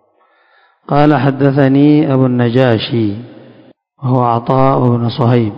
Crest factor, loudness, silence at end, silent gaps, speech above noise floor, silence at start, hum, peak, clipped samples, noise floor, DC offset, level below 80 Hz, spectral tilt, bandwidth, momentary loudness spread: 12 dB; -12 LUFS; 0 s; none; 43 dB; 0.9 s; none; 0 dBFS; 0.4%; -54 dBFS; under 0.1%; -48 dBFS; -10 dB/octave; 5.4 kHz; 7 LU